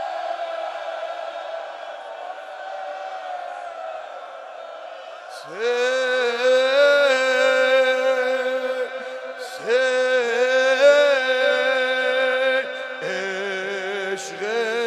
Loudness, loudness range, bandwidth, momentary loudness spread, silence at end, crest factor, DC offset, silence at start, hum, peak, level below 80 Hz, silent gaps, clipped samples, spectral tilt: -20 LUFS; 14 LU; 12.5 kHz; 18 LU; 0 s; 18 dB; under 0.1%; 0 s; none; -4 dBFS; -88 dBFS; none; under 0.1%; -1.5 dB/octave